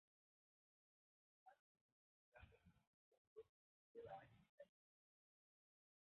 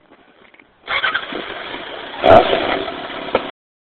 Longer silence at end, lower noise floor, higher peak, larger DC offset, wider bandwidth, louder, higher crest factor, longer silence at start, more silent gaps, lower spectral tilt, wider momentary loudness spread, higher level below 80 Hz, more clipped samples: first, 1.35 s vs 0.35 s; first, under -90 dBFS vs -49 dBFS; second, -46 dBFS vs 0 dBFS; neither; second, 3.9 kHz vs 4.8 kHz; second, -64 LUFS vs -17 LUFS; first, 24 dB vs 18 dB; first, 1.45 s vs 0.85 s; first, 1.60-1.75 s, 1.81-2.32 s, 2.87-3.12 s, 3.18-3.36 s, 3.49-3.95 s, 4.49-4.58 s vs none; about the same, -2 dB/octave vs -2 dB/octave; second, 8 LU vs 18 LU; second, -86 dBFS vs -42 dBFS; neither